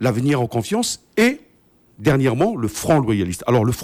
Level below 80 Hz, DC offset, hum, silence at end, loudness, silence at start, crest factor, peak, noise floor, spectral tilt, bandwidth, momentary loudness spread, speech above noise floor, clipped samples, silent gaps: -46 dBFS; under 0.1%; none; 0 s; -19 LUFS; 0 s; 16 dB; -4 dBFS; -56 dBFS; -5.5 dB/octave; 16 kHz; 5 LU; 37 dB; under 0.1%; none